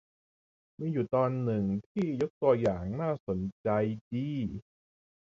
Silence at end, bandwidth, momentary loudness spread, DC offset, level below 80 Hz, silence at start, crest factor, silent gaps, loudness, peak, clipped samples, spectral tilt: 0.6 s; 7.6 kHz; 8 LU; under 0.1%; -56 dBFS; 0.8 s; 18 dB; 1.86-1.95 s, 2.30-2.41 s, 3.20-3.27 s, 3.52-3.64 s, 4.01-4.11 s; -31 LUFS; -12 dBFS; under 0.1%; -9.5 dB/octave